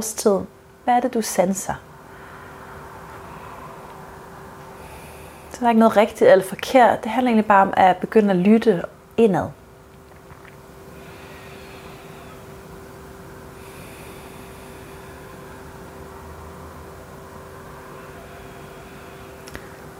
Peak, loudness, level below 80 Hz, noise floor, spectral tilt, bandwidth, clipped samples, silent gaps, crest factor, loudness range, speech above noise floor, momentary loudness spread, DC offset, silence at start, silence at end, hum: -2 dBFS; -18 LUFS; -50 dBFS; -45 dBFS; -5.5 dB/octave; 16.5 kHz; under 0.1%; none; 20 dB; 23 LU; 28 dB; 24 LU; under 0.1%; 0 s; 0.05 s; none